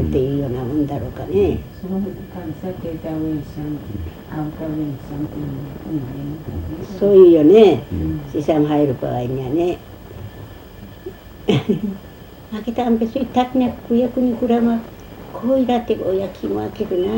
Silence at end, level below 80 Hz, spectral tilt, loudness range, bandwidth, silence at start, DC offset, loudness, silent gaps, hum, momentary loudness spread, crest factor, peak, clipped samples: 0 s; -40 dBFS; -8.5 dB/octave; 12 LU; 16 kHz; 0 s; under 0.1%; -19 LUFS; none; none; 20 LU; 18 dB; 0 dBFS; under 0.1%